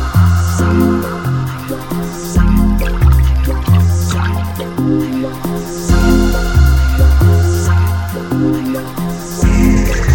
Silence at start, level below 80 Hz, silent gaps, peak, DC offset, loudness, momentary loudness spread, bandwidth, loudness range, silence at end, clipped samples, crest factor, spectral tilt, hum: 0 s; -16 dBFS; none; 0 dBFS; under 0.1%; -14 LUFS; 9 LU; 17 kHz; 2 LU; 0 s; under 0.1%; 12 dB; -6.5 dB/octave; none